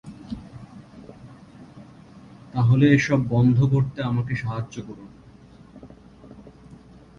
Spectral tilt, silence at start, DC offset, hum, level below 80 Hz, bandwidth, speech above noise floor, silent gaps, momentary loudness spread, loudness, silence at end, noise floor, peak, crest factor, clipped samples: -7.5 dB/octave; 0.05 s; under 0.1%; none; -50 dBFS; 7.2 kHz; 28 dB; none; 27 LU; -21 LUFS; 0.45 s; -48 dBFS; -4 dBFS; 20 dB; under 0.1%